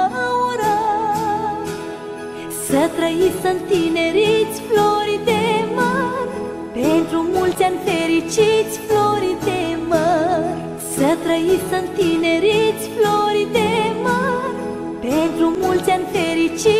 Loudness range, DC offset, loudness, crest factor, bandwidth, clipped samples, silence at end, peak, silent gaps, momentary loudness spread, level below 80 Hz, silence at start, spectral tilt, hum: 2 LU; under 0.1%; -18 LUFS; 16 dB; 15.5 kHz; under 0.1%; 0 s; -2 dBFS; none; 9 LU; -48 dBFS; 0 s; -4.5 dB/octave; none